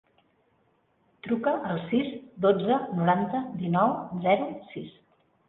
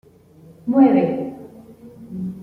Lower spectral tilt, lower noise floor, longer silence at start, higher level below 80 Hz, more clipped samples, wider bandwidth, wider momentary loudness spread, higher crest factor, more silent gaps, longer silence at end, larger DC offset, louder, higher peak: about the same, -10.5 dB/octave vs -10 dB/octave; first, -68 dBFS vs -47 dBFS; first, 1.25 s vs 0.65 s; about the same, -66 dBFS vs -62 dBFS; neither; about the same, 4.1 kHz vs 4.4 kHz; second, 15 LU vs 20 LU; about the same, 20 dB vs 18 dB; neither; first, 0.6 s vs 0 s; neither; second, -27 LUFS vs -18 LUFS; second, -8 dBFS vs -4 dBFS